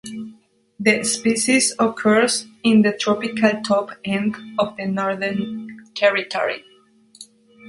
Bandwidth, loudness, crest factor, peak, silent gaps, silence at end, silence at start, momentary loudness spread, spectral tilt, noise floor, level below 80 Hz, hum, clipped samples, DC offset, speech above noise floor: 11.5 kHz; -19 LUFS; 20 dB; -2 dBFS; none; 0 s; 0.05 s; 13 LU; -3.5 dB/octave; -53 dBFS; -62 dBFS; none; under 0.1%; under 0.1%; 34 dB